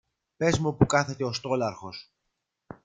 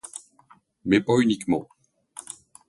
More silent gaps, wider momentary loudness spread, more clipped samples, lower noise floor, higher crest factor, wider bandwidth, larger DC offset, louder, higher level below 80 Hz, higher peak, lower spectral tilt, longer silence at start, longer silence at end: neither; second, 17 LU vs 21 LU; neither; first, -81 dBFS vs -58 dBFS; about the same, 22 dB vs 22 dB; second, 9.6 kHz vs 11.5 kHz; neither; second, -26 LUFS vs -23 LUFS; about the same, -54 dBFS vs -58 dBFS; about the same, -6 dBFS vs -6 dBFS; about the same, -5.5 dB/octave vs -5.5 dB/octave; second, 0.4 s vs 0.85 s; first, 0.85 s vs 0.35 s